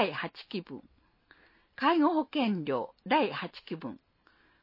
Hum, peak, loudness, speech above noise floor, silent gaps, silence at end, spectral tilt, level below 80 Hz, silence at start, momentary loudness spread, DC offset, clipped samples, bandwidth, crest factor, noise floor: none; -14 dBFS; -31 LUFS; 35 dB; none; 0.65 s; -8 dB/octave; -74 dBFS; 0 s; 20 LU; under 0.1%; under 0.1%; 5.8 kHz; 18 dB; -66 dBFS